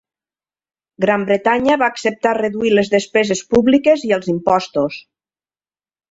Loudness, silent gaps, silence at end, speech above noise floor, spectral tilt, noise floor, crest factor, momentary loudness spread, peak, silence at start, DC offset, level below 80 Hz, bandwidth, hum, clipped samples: -16 LUFS; none; 1.1 s; over 75 dB; -5 dB/octave; under -90 dBFS; 16 dB; 6 LU; 0 dBFS; 1 s; under 0.1%; -52 dBFS; 8 kHz; none; under 0.1%